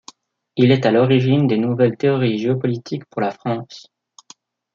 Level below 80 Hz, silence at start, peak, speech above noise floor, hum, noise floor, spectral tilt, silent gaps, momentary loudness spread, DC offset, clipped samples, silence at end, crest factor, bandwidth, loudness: -64 dBFS; 0.55 s; -2 dBFS; 32 dB; none; -50 dBFS; -8 dB/octave; none; 12 LU; under 0.1%; under 0.1%; 0.95 s; 16 dB; 7.4 kHz; -18 LUFS